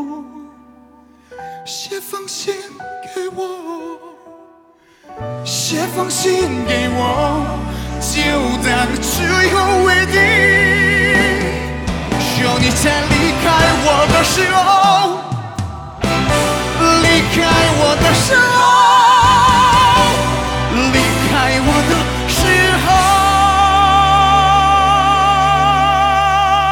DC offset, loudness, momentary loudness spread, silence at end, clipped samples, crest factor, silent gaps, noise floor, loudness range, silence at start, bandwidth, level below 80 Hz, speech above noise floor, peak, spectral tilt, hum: under 0.1%; -12 LUFS; 15 LU; 0 s; under 0.1%; 12 dB; none; -48 dBFS; 16 LU; 0 s; 20 kHz; -28 dBFS; 34 dB; -2 dBFS; -3.5 dB/octave; none